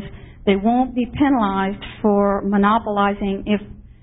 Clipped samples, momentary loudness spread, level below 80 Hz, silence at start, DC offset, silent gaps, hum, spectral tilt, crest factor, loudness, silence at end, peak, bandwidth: under 0.1%; 7 LU; -40 dBFS; 0 s; under 0.1%; none; none; -12 dB/octave; 16 dB; -19 LUFS; 0.2 s; -2 dBFS; 4 kHz